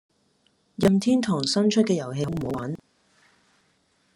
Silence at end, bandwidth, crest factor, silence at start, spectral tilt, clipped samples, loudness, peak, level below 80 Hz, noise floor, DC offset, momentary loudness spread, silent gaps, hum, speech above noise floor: 1.4 s; 15 kHz; 20 dB; 0.8 s; -5.5 dB/octave; under 0.1%; -24 LUFS; -6 dBFS; -58 dBFS; -67 dBFS; under 0.1%; 13 LU; none; none; 44 dB